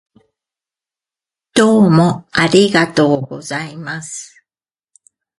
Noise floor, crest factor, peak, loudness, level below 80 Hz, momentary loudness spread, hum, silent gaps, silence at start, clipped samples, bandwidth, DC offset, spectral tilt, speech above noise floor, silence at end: under -90 dBFS; 16 dB; 0 dBFS; -13 LUFS; -54 dBFS; 15 LU; none; none; 1.55 s; under 0.1%; 11.5 kHz; under 0.1%; -5.5 dB/octave; over 77 dB; 1.15 s